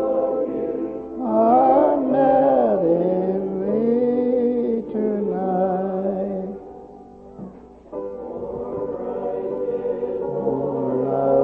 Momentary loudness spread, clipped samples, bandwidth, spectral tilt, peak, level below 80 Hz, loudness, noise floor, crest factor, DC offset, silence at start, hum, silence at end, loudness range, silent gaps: 15 LU; under 0.1%; 4.2 kHz; -11 dB/octave; -6 dBFS; -54 dBFS; -21 LUFS; -42 dBFS; 16 dB; under 0.1%; 0 s; none; 0 s; 11 LU; none